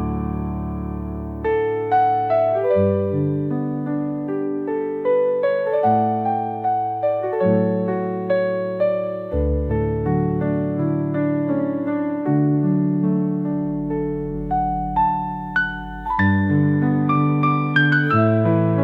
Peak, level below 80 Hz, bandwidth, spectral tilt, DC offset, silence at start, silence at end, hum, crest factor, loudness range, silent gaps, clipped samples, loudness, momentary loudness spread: -6 dBFS; -38 dBFS; 5 kHz; -10 dB/octave; under 0.1%; 0 s; 0 s; none; 14 dB; 3 LU; none; under 0.1%; -20 LUFS; 7 LU